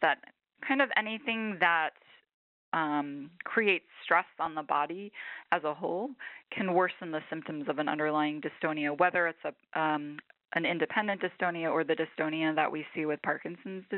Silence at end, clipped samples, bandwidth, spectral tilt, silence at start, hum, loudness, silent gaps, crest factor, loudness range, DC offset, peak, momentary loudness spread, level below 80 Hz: 0 s; under 0.1%; 4.9 kHz; -2.5 dB/octave; 0 s; none; -31 LUFS; 2.34-2.72 s; 22 dB; 2 LU; under 0.1%; -10 dBFS; 13 LU; -82 dBFS